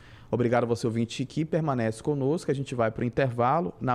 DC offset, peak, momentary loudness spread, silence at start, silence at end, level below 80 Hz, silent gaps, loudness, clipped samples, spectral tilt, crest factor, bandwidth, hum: under 0.1%; -12 dBFS; 5 LU; 0 s; 0 s; -56 dBFS; none; -27 LUFS; under 0.1%; -7 dB/octave; 14 dB; 12 kHz; none